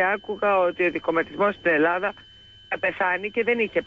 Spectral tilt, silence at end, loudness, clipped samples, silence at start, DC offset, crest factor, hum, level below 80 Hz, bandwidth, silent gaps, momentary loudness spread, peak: -6.5 dB/octave; 0 s; -23 LUFS; under 0.1%; 0 s; under 0.1%; 14 dB; none; -60 dBFS; 7.4 kHz; none; 6 LU; -10 dBFS